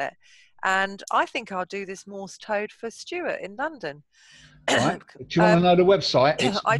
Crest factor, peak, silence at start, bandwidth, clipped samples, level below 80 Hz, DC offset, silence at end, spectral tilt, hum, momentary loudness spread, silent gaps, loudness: 20 dB; -4 dBFS; 0 s; 12 kHz; under 0.1%; -58 dBFS; under 0.1%; 0 s; -5 dB/octave; none; 18 LU; none; -23 LUFS